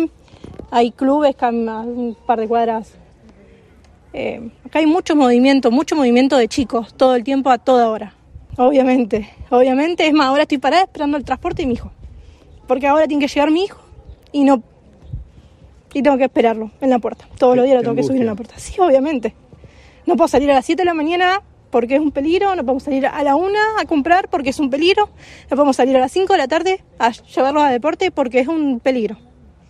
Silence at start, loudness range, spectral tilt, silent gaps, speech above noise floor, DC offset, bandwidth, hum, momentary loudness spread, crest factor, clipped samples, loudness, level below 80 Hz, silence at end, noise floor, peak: 0 s; 4 LU; -5 dB/octave; none; 32 dB; under 0.1%; 12 kHz; none; 11 LU; 14 dB; under 0.1%; -16 LUFS; -44 dBFS; 0.55 s; -47 dBFS; -2 dBFS